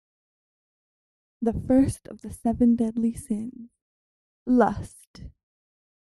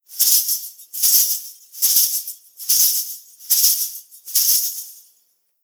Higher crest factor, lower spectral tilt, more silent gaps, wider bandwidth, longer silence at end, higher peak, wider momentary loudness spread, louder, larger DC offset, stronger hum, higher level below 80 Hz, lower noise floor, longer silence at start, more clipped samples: about the same, 20 dB vs 20 dB; first, -7.5 dB/octave vs 7.5 dB/octave; first, 3.81-4.46 s, 5.07-5.14 s vs none; second, 12 kHz vs over 20 kHz; first, 0.85 s vs 0.7 s; second, -6 dBFS vs 0 dBFS; about the same, 17 LU vs 18 LU; second, -24 LUFS vs -16 LUFS; neither; neither; first, -48 dBFS vs -86 dBFS; first, under -90 dBFS vs -63 dBFS; first, 1.4 s vs 0.1 s; neither